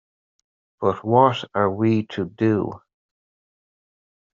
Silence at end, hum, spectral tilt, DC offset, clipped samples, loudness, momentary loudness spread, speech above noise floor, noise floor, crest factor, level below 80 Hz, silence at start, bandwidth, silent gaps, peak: 1.55 s; none; -6 dB/octave; under 0.1%; under 0.1%; -21 LUFS; 8 LU; over 70 dB; under -90 dBFS; 20 dB; -64 dBFS; 0.8 s; 7.4 kHz; none; -2 dBFS